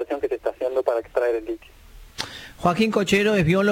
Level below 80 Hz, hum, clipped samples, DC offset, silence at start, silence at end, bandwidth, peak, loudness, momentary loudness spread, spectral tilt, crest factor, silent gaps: -48 dBFS; none; under 0.1%; under 0.1%; 0 s; 0 s; 17 kHz; -6 dBFS; -23 LUFS; 14 LU; -5.5 dB/octave; 16 dB; none